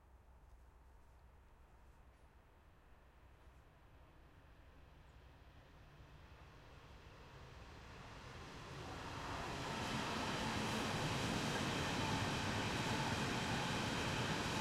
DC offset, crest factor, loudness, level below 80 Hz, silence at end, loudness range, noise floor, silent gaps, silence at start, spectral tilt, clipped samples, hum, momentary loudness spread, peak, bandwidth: under 0.1%; 18 dB; -41 LUFS; -60 dBFS; 0 s; 24 LU; -66 dBFS; none; 0.05 s; -4 dB/octave; under 0.1%; none; 24 LU; -28 dBFS; 16 kHz